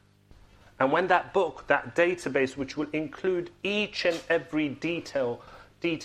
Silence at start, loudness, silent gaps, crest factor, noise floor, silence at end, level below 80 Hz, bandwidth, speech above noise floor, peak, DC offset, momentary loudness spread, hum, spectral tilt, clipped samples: 0.8 s; -28 LUFS; none; 22 dB; -56 dBFS; 0 s; -60 dBFS; 12.5 kHz; 28 dB; -6 dBFS; under 0.1%; 8 LU; none; -5 dB/octave; under 0.1%